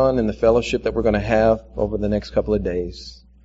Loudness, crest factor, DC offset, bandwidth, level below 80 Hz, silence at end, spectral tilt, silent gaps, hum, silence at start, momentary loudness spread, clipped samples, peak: -20 LUFS; 16 dB; under 0.1%; 8 kHz; -34 dBFS; 0.3 s; -6 dB/octave; none; none; 0 s; 10 LU; under 0.1%; -4 dBFS